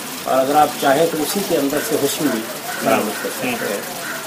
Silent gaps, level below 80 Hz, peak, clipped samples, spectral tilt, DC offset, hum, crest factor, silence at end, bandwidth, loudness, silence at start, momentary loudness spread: none; -58 dBFS; 0 dBFS; under 0.1%; -3 dB/octave; under 0.1%; none; 18 dB; 0 s; 16 kHz; -18 LUFS; 0 s; 8 LU